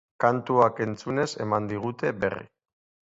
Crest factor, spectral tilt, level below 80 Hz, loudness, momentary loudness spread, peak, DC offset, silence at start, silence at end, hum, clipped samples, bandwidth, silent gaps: 20 dB; -6.5 dB/octave; -62 dBFS; -26 LUFS; 9 LU; -6 dBFS; under 0.1%; 0.2 s; 0.65 s; none; under 0.1%; 8 kHz; none